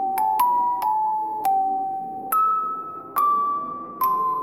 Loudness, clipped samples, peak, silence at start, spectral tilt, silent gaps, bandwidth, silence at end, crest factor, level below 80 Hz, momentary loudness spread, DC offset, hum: -23 LUFS; under 0.1%; -8 dBFS; 0 s; -3.5 dB/octave; none; 17 kHz; 0 s; 16 dB; -70 dBFS; 8 LU; under 0.1%; none